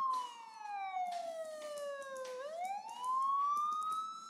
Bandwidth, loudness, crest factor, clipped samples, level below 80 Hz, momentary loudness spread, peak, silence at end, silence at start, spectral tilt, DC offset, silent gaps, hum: 15.5 kHz; -39 LUFS; 12 dB; under 0.1%; under -90 dBFS; 11 LU; -28 dBFS; 0 s; 0 s; -0.5 dB/octave; under 0.1%; none; none